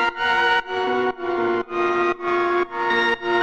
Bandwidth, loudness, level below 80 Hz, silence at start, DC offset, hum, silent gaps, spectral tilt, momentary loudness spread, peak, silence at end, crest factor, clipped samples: 7.8 kHz; -21 LUFS; -54 dBFS; 0 s; under 0.1%; none; none; -4.5 dB/octave; 4 LU; -6 dBFS; 0 s; 14 dB; under 0.1%